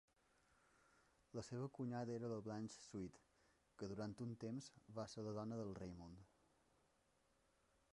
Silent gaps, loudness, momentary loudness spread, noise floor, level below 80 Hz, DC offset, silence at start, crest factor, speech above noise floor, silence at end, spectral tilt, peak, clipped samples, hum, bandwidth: none; -51 LUFS; 8 LU; -81 dBFS; -76 dBFS; under 0.1%; 1.35 s; 18 dB; 31 dB; 1.7 s; -6.5 dB/octave; -36 dBFS; under 0.1%; none; 11 kHz